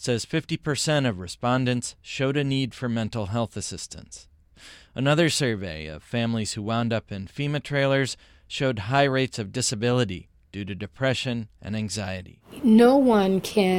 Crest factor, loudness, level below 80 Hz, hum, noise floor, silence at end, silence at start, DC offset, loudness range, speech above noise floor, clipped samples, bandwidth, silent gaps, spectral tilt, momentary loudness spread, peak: 18 dB; -24 LUFS; -54 dBFS; none; -50 dBFS; 0 s; 0 s; under 0.1%; 5 LU; 26 dB; under 0.1%; 16.5 kHz; none; -5 dB/octave; 16 LU; -6 dBFS